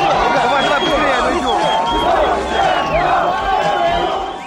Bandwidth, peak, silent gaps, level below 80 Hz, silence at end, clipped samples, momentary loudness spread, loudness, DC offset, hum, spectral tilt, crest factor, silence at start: 16 kHz; -4 dBFS; none; -34 dBFS; 0 s; under 0.1%; 2 LU; -15 LUFS; under 0.1%; none; -4 dB/octave; 12 dB; 0 s